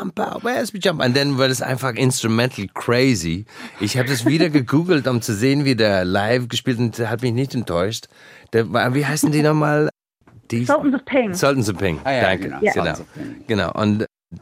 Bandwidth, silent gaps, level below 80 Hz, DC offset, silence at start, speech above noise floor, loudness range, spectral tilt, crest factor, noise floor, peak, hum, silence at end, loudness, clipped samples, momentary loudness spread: 16 kHz; none; -54 dBFS; under 0.1%; 0 s; 32 dB; 2 LU; -5.5 dB/octave; 18 dB; -51 dBFS; -2 dBFS; none; 0.05 s; -19 LUFS; under 0.1%; 8 LU